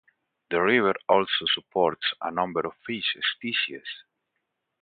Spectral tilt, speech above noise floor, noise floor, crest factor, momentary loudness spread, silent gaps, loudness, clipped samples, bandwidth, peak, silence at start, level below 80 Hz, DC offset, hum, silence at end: -8.5 dB/octave; 54 dB; -80 dBFS; 22 dB; 9 LU; none; -25 LUFS; under 0.1%; 4.9 kHz; -6 dBFS; 0.5 s; -66 dBFS; under 0.1%; none; 0.8 s